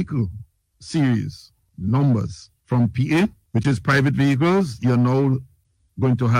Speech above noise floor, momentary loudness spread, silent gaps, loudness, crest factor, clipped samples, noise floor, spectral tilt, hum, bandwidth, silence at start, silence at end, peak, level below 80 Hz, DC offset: 37 dB; 12 LU; none; -20 LUFS; 16 dB; under 0.1%; -56 dBFS; -7.5 dB/octave; none; 10.5 kHz; 0 s; 0 s; -6 dBFS; -48 dBFS; under 0.1%